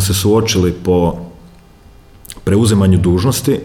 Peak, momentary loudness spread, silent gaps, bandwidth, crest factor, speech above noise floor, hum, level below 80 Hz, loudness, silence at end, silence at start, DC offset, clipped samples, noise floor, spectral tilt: -2 dBFS; 15 LU; none; 17.5 kHz; 12 dB; 29 dB; none; -34 dBFS; -13 LUFS; 0 s; 0 s; under 0.1%; under 0.1%; -42 dBFS; -5.5 dB/octave